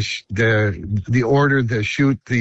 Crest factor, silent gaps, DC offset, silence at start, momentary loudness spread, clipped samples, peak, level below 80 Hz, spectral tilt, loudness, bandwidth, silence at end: 12 dB; none; under 0.1%; 0 s; 6 LU; under 0.1%; -6 dBFS; -44 dBFS; -6.5 dB/octave; -18 LUFS; 8.2 kHz; 0 s